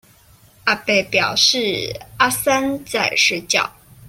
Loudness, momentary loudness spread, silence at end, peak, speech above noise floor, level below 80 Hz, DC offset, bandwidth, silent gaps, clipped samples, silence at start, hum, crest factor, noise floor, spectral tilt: -17 LUFS; 9 LU; 0.4 s; -2 dBFS; 32 dB; -52 dBFS; under 0.1%; 16.5 kHz; none; under 0.1%; 0.65 s; none; 18 dB; -50 dBFS; -2 dB/octave